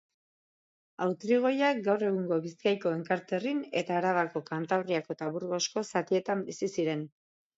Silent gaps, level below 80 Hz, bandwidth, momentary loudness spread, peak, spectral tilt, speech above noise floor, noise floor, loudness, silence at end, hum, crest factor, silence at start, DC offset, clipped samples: none; -80 dBFS; 8 kHz; 7 LU; -14 dBFS; -5 dB/octave; over 60 dB; under -90 dBFS; -31 LUFS; 0.5 s; none; 18 dB; 1 s; under 0.1%; under 0.1%